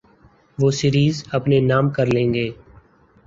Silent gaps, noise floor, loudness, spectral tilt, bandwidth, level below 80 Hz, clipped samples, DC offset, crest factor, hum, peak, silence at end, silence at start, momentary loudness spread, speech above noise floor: none; -53 dBFS; -19 LUFS; -6.5 dB/octave; 7.6 kHz; -48 dBFS; under 0.1%; under 0.1%; 16 dB; none; -4 dBFS; 0.75 s; 0.6 s; 7 LU; 35 dB